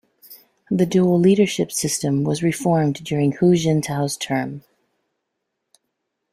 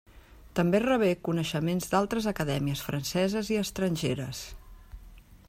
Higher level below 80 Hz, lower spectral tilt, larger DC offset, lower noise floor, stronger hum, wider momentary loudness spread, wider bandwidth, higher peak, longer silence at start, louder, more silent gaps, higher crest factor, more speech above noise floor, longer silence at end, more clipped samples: second, -58 dBFS vs -50 dBFS; about the same, -5.5 dB/octave vs -5.5 dB/octave; neither; first, -78 dBFS vs -52 dBFS; neither; about the same, 8 LU vs 8 LU; about the same, 15.5 kHz vs 16 kHz; first, -4 dBFS vs -12 dBFS; first, 0.3 s vs 0.15 s; first, -19 LUFS vs -29 LUFS; neither; about the same, 16 dB vs 18 dB; first, 59 dB vs 24 dB; first, 1.75 s vs 0.1 s; neither